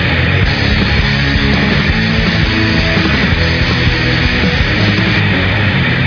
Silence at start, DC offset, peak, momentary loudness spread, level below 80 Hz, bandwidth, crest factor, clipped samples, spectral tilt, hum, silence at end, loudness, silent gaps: 0 s; under 0.1%; 0 dBFS; 1 LU; -20 dBFS; 5.4 kHz; 12 dB; under 0.1%; -6 dB/octave; none; 0 s; -11 LUFS; none